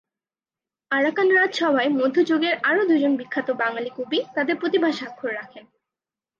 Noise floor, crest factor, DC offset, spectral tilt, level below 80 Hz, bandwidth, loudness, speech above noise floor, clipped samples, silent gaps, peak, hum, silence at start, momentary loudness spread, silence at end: under -90 dBFS; 14 dB; under 0.1%; -4.5 dB/octave; -78 dBFS; 7.4 kHz; -22 LUFS; over 68 dB; under 0.1%; none; -8 dBFS; none; 0.9 s; 11 LU; 0.8 s